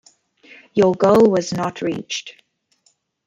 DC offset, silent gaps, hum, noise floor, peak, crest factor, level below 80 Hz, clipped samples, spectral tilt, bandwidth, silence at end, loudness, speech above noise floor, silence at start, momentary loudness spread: under 0.1%; none; none; -63 dBFS; -2 dBFS; 18 dB; -58 dBFS; under 0.1%; -5.5 dB/octave; 15 kHz; 0.95 s; -18 LUFS; 46 dB; 0.75 s; 14 LU